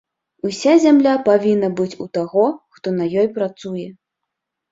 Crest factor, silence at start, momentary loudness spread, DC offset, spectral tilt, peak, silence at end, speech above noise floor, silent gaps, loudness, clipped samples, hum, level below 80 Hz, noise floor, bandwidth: 16 dB; 0.45 s; 15 LU; under 0.1%; -6 dB/octave; -2 dBFS; 0.8 s; 63 dB; none; -17 LUFS; under 0.1%; none; -62 dBFS; -80 dBFS; 7.8 kHz